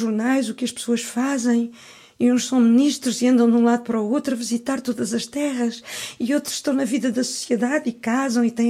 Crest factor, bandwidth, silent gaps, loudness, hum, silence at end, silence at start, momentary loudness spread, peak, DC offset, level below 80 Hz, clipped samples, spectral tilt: 14 dB; 15 kHz; none; -21 LUFS; none; 0 s; 0 s; 9 LU; -6 dBFS; under 0.1%; -68 dBFS; under 0.1%; -4 dB/octave